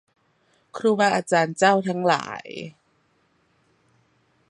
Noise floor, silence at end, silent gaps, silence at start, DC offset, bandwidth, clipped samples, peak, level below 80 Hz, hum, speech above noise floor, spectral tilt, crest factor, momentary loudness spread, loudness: -65 dBFS; 1.8 s; none; 0.75 s; under 0.1%; 11.5 kHz; under 0.1%; -4 dBFS; -72 dBFS; none; 44 dB; -4.5 dB/octave; 22 dB; 18 LU; -21 LUFS